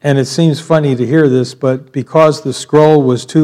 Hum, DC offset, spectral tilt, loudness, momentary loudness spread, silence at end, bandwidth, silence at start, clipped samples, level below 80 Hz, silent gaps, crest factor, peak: none; under 0.1%; -6.5 dB/octave; -12 LUFS; 7 LU; 0 s; 13 kHz; 0.05 s; 0.8%; -54 dBFS; none; 10 dB; 0 dBFS